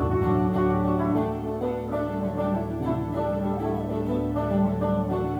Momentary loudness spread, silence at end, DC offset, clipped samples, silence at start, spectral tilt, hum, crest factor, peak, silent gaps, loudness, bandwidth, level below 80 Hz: 5 LU; 0 s; under 0.1%; under 0.1%; 0 s; -9.5 dB/octave; none; 14 dB; -12 dBFS; none; -26 LUFS; 13.5 kHz; -40 dBFS